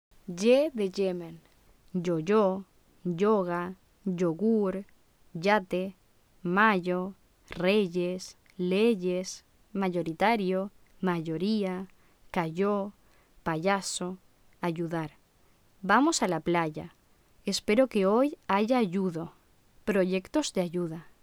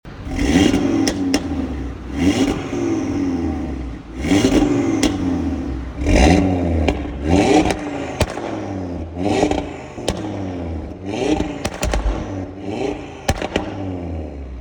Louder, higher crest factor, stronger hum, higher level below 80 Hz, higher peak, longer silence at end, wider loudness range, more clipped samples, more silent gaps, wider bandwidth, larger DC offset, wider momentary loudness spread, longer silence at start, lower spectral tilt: second, -29 LUFS vs -20 LUFS; about the same, 20 dB vs 18 dB; neither; second, -62 dBFS vs -28 dBFS; second, -10 dBFS vs -2 dBFS; first, 0.15 s vs 0 s; about the same, 4 LU vs 6 LU; neither; neither; second, 16.5 kHz vs 19 kHz; neither; about the same, 15 LU vs 13 LU; first, 0.3 s vs 0.05 s; about the same, -5.5 dB/octave vs -5.5 dB/octave